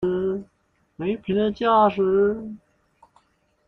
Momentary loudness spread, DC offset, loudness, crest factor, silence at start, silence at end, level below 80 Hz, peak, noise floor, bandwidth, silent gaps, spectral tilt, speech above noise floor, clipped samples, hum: 15 LU; under 0.1%; -22 LUFS; 16 dB; 0 s; 1.1 s; -56 dBFS; -8 dBFS; -67 dBFS; 5.8 kHz; none; -8.5 dB/octave; 46 dB; under 0.1%; none